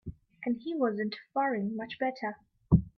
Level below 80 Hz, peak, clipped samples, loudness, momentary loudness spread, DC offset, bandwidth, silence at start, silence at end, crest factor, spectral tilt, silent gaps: -48 dBFS; -8 dBFS; under 0.1%; -32 LUFS; 11 LU; under 0.1%; 6 kHz; 0.05 s; 0.1 s; 22 dB; -9.5 dB/octave; none